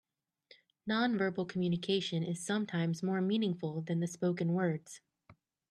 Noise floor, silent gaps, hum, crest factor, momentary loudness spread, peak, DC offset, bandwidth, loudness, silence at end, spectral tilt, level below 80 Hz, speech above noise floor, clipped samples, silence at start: -66 dBFS; none; none; 16 dB; 6 LU; -20 dBFS; under 0.1%; 12 kHz; -34 LUFS; 0.4 s; -6 dB/octave; -78 dBFS; 32 dB; under 0.1%; 0.85 s